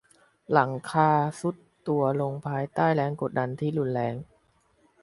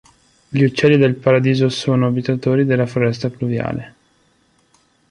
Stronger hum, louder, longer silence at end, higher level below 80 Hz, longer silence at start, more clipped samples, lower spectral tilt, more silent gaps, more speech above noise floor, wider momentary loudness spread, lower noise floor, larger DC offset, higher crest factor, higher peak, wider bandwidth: neither; second, -27 LUFS vs -17 LUFS; second, 0.8 s vs 1.2 s; second, -66 dBFS vs -52 dBFS; about the same, 0.5 s vs 0.5 s; neither; about the same, -7.5 dB/octave vs -7 dB/octave; neither; about the same, 40 dB vs 43 dB; about the same, 10 LU vs 9 LU; first, -66 dBFS vs -59 dBFS; neither; first, 22 dB vs 16 dB; second, -6 dBFS vs -2 dBFS; about the same, 11.5 kHz vs 10.5 kHz